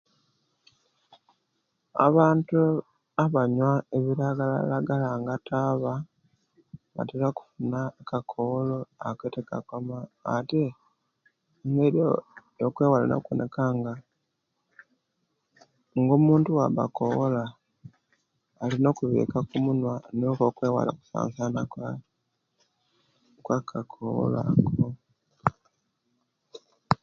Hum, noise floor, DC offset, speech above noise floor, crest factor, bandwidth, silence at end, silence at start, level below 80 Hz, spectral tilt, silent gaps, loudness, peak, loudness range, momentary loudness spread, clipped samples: none; -78 dBFS; under 0.1%; 53 dB; 24 dB; 7.2 kHz; 0.05 s; 1.95 s; -62 dBFS; -9 dB/octave; none; -27 LUFS; -2 dBFS; 7 LU; 13 LU; under 0.1%